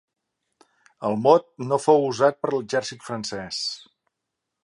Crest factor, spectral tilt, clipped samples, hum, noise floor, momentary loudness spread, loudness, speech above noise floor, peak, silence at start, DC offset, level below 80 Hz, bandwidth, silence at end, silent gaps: 22 dB; -4.5 dB/octave; under 0.1%; none; -82 dBFS; 12 LU; -23 LUFS; 60 dB; -2 dBFS; 1 s; under 0.1%; -68 dBFS; 11.5 kHz; 0.85 s; none